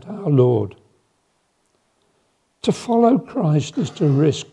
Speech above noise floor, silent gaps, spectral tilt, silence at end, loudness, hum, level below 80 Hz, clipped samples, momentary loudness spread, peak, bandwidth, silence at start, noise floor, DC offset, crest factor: 49 dB; none; -7.5 dB/octave; 0.1 s; -19 LUFS; none; -64 dBFS; under 0.1%; 8 LU; -2 dBFS; 11 kHz; 0.05 s; -66 dBFS; under 0.1%; 18 dB